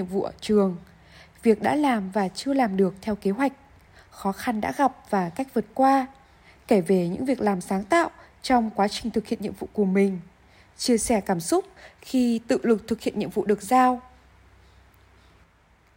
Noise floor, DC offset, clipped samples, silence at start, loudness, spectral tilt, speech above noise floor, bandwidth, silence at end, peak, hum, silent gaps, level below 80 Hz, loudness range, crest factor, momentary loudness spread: -59 dBFS; under 0.1%; under 0.1%; 0 s; -24 LUFS; -5.5 dB/octave; 36 dB; 16.5 kHz; 1.95 s; -6 dBFS; none; none; -56 dBFS; 2 LU; 18 dB; 9 LU